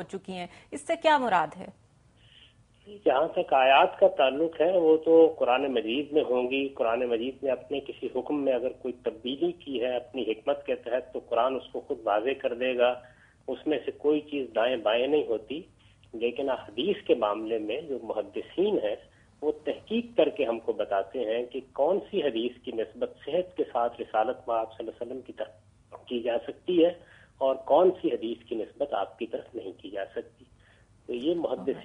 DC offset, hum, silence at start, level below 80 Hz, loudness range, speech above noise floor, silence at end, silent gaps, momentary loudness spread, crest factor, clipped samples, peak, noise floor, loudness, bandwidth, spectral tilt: under 0.1%; none; 0 s; -66 dBFS; 8 LU; 32 dB; 0 s; none; 15 LU; 20 dB; under 0.1%; -8 dBFS; -59 dBFS; -28 LUFS; 10.5 kHz; -5.5 dB/octave